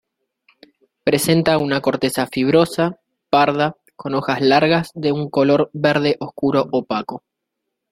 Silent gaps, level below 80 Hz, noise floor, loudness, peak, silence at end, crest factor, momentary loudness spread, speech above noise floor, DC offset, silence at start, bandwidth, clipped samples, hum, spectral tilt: none; -56 dBFS; -78 dBFS; -18 LUFS; -2 dBFS; 0.75 s; 18 dB; 8 LU; 61 dB; under 0.1%; 1.05 s; 16 kHz; under 0.1%; none; -5.5 dB/octave